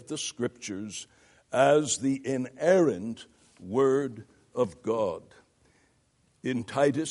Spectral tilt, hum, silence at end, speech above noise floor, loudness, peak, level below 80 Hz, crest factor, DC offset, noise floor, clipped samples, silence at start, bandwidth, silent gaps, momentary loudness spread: -4.5 dB/octave; none; 0 s; 41 dB; -28 LUFS; -8 dBFS; -70 dBFS; 20 dB; under 0.1%; -68 dBFS; under 0.1%; 0.1 s; 11.5 kHz; none; 17 LU